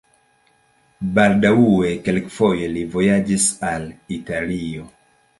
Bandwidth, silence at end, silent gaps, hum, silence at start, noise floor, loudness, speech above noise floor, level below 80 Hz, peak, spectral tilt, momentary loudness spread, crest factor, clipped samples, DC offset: 11.5 kHz; 0.5 s; none; none; 1 s; -59 dBFS; -18 LUFS; 41 dB; -46 dBFS; -2 dBFS; -5 dB/octave; 15 LU; 18 dB; under 0.1%; under 0.1%